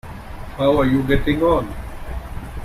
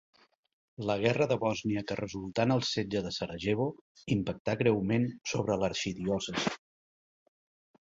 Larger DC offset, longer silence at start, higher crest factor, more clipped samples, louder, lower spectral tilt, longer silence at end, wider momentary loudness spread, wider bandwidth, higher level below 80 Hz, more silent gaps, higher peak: neither; second, 0.05 s vs 0.8 s; second, 16 dB vs 22 dB; neither; first, -18 LUFS vs -31 LUFS; first, -7.5 dB/octave vs -5.5 dB/octave; second, 0 s vs 1.25 s; first, 17 LU vs 8 LU; first, 15 kHz vs 8 kHz; first, -30 dBFS vs -58 dBFS; second, none vs 3.81-3.95 s, 4.40-4.45 s; first, -4 dBFS vs -10 dBFS